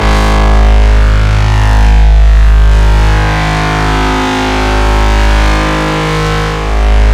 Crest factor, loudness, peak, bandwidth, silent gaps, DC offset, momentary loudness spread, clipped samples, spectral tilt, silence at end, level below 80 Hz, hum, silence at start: 6 dB; -10 LUFS; 0 dBFS; 10 kHz; none; 2%; 4 LU; 0.5%; -5.5 dB/octave; 0 s; -8 dBFS; none; 0 s